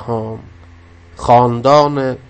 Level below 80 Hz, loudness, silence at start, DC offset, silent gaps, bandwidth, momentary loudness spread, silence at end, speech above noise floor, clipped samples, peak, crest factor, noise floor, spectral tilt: -42 dBFS; -13 LUFS; 0 s; under 0.1%; none; 8.8 kHz; 16 LU; 0.15 s; 28 dB; under 0.1%; 0 dBFS; 14 dB; -41 dBFS; -7 dB/octave